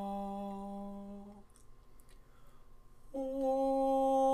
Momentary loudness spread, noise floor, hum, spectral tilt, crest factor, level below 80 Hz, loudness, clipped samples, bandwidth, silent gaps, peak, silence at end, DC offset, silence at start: 19 LU; -56 dBFS; none; -7.5 dB/octave; 16 dB; -58 dBFS; -35 LUFS; under 0.1%; 13.5 kHz; none; -22 dBFS; 0 s; under 0.1%; 0 s